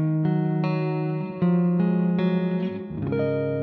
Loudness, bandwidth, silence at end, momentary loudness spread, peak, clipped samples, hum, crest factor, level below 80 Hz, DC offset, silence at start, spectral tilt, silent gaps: -24 LUFS; 4.7 kHz; 0 s; 6 LU; -12 dBFS; under 0.1%; none; 12 dB; -60 dBFS; under 0.1%; 0 s; -11.5 dB/octave; none